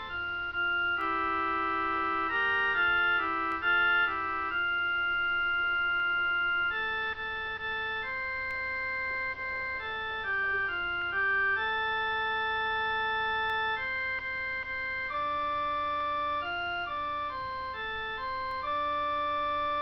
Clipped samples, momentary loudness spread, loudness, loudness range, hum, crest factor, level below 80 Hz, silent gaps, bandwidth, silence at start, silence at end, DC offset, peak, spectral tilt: under 0.1%; 7 LU; -30 LUFS; 5 LU; none; 14 dB; -56 dBFS; none; 6.2 kHz; 0 s; 0 s; under 0.1%; -18 dBFS; -4.5 dB/octave